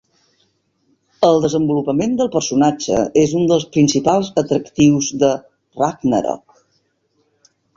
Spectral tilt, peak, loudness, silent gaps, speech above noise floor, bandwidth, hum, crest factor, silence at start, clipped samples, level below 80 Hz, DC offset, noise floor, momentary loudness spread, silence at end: -5.5 dB/octave; -2 dBFS; -16 LUFS; none; 49 dB; 7.6 kHz; none; 16 dB; 1.2 s; under 0.1%; -52 dBFS; under 0.1%; -64 dBFS; 6 LU; 1.4 s